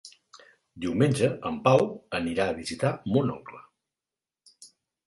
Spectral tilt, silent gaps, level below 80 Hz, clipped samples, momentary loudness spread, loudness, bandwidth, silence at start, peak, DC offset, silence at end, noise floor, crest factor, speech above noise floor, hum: -6.5 dB/octave; none; -58 dBFS; under 0.1%; 10 LU; -26 LUFS; 11.5 kHz; 0.05 s; -6 dBFS; under 0.1%; 0.4 s; under -90 dBFS; 22 dB; over 64 dB; none